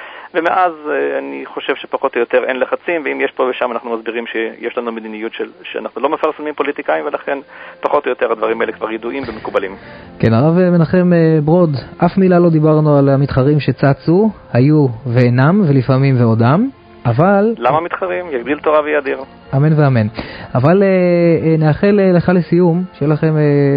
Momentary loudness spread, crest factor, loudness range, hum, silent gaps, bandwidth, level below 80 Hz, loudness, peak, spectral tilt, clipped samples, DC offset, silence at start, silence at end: 11 LU; 14 dB; 8 LU; none; none; 5.2 kHz; -44 dBFS; -14 LUFS; 0 dBFS; -10.5 dB/octave; under 0.1%; under 0.1%; 0 s; 0 s